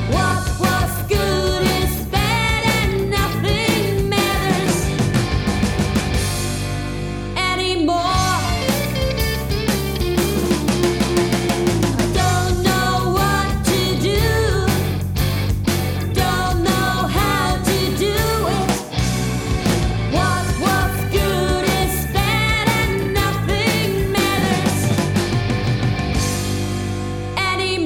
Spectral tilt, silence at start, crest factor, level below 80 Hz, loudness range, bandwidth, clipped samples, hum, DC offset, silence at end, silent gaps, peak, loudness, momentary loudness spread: -5 dB/octave; 0 s; 14 dB; -28 dBFS; 2 LU; over 20 kHz; under 0.1%; none; under 0.1%; 0 s; none; -4 dBFS; -19 LUFS; 4 LU